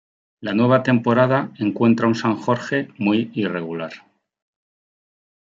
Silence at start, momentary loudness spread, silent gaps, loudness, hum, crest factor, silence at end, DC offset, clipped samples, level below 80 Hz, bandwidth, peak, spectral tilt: 0.4 s; 11 LU; none; -20 LUFS; none; 18 dB; 1.5 s; under 0.1%; under 0.1%; -66 dBFS; 7.6 kHz; -2 dBFS; -7.5 dB/octave